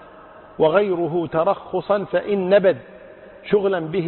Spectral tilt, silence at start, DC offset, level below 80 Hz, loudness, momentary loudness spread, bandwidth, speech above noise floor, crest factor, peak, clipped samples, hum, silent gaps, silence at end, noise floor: -11.5 dB/octave; 0 s; under 0.1%; -56 dBFS; -20 LUFS; 8 LU; 4.3 kHz; 24 dB; 16 dB; -6 dBFS; under 0.1%; none; none; 0 s; -43 dBFS